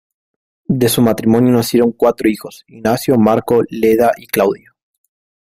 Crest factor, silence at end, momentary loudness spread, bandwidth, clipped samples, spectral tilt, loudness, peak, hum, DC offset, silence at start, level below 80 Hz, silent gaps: 14 dB; 0.9 s; 9 LU; 16 kHz; under 0.1%; -6 dB/octave; -14 LUFS; 0 dBFS; none; under 0.1%; 0.7 s; -50 dBFS; none